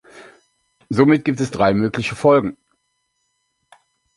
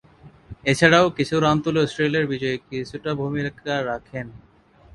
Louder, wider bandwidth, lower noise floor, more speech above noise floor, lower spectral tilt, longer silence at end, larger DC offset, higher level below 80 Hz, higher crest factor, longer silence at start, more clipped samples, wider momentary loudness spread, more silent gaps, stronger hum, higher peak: first, -17 LUFS vs -21 LUFS; about the same, 11.5 kHz vs 11.5 kHz; first, -70 dBFS vs -46 dBFS; first, 54 dB vs 25 dB; first, -7 dB/octave vs -5.5 dB/octave; first, 1.65 s vs 0.55 s; neither; about the same, -52 dBFS vs -52 dBFS; about the same, 18 dB vs 22 dB; about the same, 0.15 s vs 0.25 s; neither; second, 7 LU vs 15 LU; neither; neither; about the same, -2 dBFS vs 0 dBFS